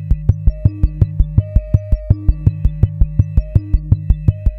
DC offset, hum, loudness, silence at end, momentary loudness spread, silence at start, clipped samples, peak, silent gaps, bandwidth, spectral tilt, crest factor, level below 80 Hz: under 0.1%; none; -17 LUFS; 0 s; 2 LU; 0 s; 0.5%; 0 dBFS; none; 2.8 kHz; -12 dB/octave; 14 dB; -18 dBFS